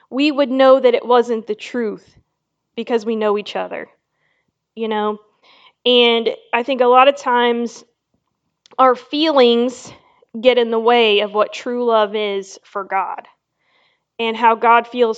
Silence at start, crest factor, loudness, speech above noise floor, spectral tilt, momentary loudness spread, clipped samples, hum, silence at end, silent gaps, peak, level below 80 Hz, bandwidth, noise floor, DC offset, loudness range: 0.1 s; 18 dB; -16 LUFS; 58 dB; -4 dB/octave; 16 LU; under 0.1%; none; 0 s; none; 0 dBFS; -70 dBFS; 8 kHz; -74 dBFS; under 0.1%; 8 LU